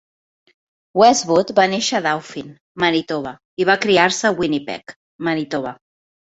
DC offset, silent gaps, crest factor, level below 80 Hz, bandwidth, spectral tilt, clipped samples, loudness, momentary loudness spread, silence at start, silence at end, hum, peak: under 0.1%; 2.61-2.75 s, 3.45-3.57 s, 4.96-5.19 s; 18 dB; -60 dBFS; 8.2 kHz; -3.5 dB/octave; under 0.1%; -18 LUFS; 17 LU; 0.95 s; 0.6 s; none; -2 dBFS